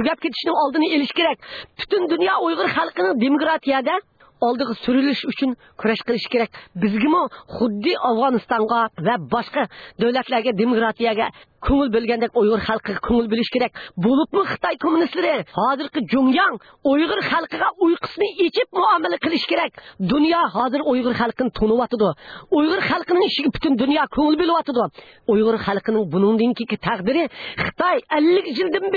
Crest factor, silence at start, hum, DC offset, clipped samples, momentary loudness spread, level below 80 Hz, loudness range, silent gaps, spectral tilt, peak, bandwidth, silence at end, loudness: 14 dB; 0 s; none; under 0.1%; under 0.1%; 6 LU; -46 dBFS; 2 LU; none; -7.5 dB/octave; -6 dBFS; 4.9 kHz; 0 s; -20 LUFS